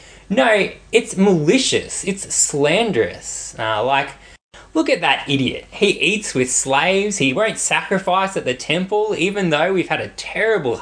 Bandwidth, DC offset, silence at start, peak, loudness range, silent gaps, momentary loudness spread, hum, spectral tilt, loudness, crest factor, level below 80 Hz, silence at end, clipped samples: 10.5 kHz; under 0.1%; 0.05 s; -2 dBFS; 2 LU; 4.41-4.51 s; 8 LU; none; -3.5 dB/octave; -18 LUFS; 18 dB; -50 dBFS; 0 s; under 0.1%